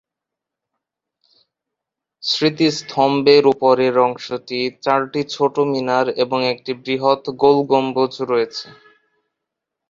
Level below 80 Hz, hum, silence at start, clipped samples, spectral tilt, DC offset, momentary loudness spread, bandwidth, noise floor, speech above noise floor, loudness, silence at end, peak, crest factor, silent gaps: -64 dBFS; none; 2.25 s; under 0.1%; -5 dB/octave; under 0.1%; 11 LU; 7.6 kHz; -84 dBFS; 67 dB; -17 LUFS; 1.2 s; -2 dBFS; 18 dB; none